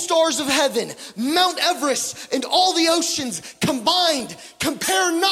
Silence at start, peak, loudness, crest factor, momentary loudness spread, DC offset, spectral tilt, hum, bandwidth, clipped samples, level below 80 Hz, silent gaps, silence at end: 0 s; -4 dBFS; -19 LUFS; 16 dB; 9 LU; under 0.1%; -2 dB/octave; none; 16.5 kHz; under 0.1%; -62 dBFS; none; 0 s